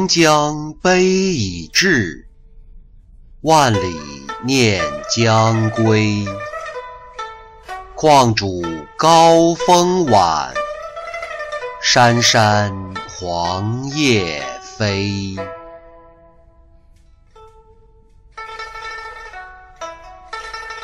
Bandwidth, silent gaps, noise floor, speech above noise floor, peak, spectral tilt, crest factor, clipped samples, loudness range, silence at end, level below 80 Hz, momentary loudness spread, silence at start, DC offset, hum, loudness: 16 kHz; none; -48 dBFS; 33 dB; -2 dBFS; -4 dB/octave; 16 dB; under 0.1%; 19 LU; 0 s; -44 dBFS; 20 LU; 0 s; under 0.1%; none; -15 LUFS